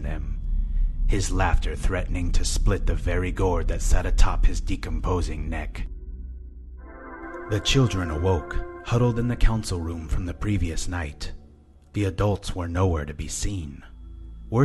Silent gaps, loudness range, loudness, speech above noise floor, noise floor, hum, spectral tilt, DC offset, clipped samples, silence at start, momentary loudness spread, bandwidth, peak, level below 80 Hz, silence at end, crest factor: none; 4 LU; -27 LUFS; 28 dB; -51 dBFS; none; -5.5 dB/octave; under 0.1%; under 0.1%; 0 s; 16 LU; 12 kHz; -4 dBFS; -26 dBFS; 0 s; 20 dB